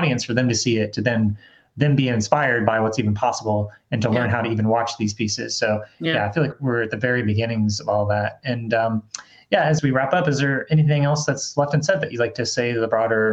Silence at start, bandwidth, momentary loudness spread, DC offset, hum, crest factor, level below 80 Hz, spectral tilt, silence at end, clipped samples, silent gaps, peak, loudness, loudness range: 0 s; 8.4 kHz; 6 LU; under 0.1%; none; 20 dB; -58 dBFS; -5.5 dB/octave; 0 s; under 0.1%; none; -2 dBFS; -21 LUFS; 2 LU